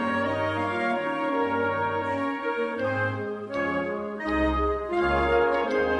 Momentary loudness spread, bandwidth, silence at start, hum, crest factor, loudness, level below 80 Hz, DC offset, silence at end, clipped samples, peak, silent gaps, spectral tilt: 6 LU; 11 kHz; 0 s; none; 16 dB; -26 LUFS; -42 dBFS; under 0.1%; 0 s; under 0.1%; -10 dBFS; none; -7 dB/octave